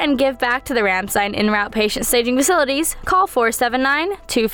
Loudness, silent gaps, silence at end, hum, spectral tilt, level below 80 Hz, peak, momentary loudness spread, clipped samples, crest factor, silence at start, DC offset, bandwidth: -17 LUFS; none; 0 s; none; -2.5 dB/octave; -42 dBFS; -6 dBFS; 4 LU; under 0.1%; 12 dB; 0 s; under 0.1%; over 20 kHz